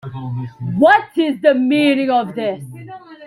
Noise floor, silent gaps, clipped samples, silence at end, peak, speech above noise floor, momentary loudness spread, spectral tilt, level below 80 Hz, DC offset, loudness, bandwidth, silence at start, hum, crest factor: -35 dBFS; none; under 0.1%; 0 s; 0 dBFS; 20 dB; 19 LU; -7 dB/octave; -58 dBFS; under 0.1%; -16 LUFS; 12 kHz; 0.05 s; none; 16 dB